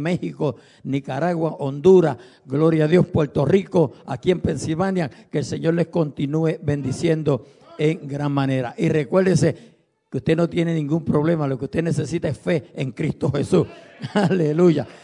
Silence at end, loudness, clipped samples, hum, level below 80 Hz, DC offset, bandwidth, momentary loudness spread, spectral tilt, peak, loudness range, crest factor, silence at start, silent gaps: 0.1 s; -21 LUFS; under 0.1%; none; -52 dBFS; under 0.1%; 11 kHz; 9 LU; -7.5 dB/octave; -4 dBFS; 4 LU; 16 dB; 0 s; none